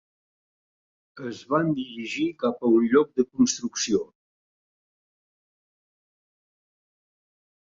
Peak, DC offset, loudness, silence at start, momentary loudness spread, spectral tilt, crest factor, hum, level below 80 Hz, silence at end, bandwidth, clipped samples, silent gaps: -6 dBFS; under 0.1%; -24 LUFS; 1.15 s; 16 LU; -4.5 dB/octave; 22 dB; none; -66 dBFS; 3.6 s; 7.8 kHz; under 0.1%; none